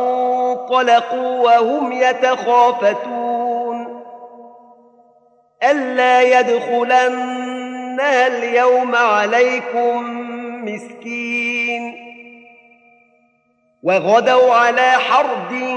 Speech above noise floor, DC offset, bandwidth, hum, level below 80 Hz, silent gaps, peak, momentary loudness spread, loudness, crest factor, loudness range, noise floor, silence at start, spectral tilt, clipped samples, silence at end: 46 dB; under 0.1%; 8.6 kHz; none; -80 dBFS; none; -2 dBFS; 14 LU; -15 LUFS; 16 dB; 7 LU; -61 dBFS; 0 s; -3.5 dB/octave; under 0.1%; 0 s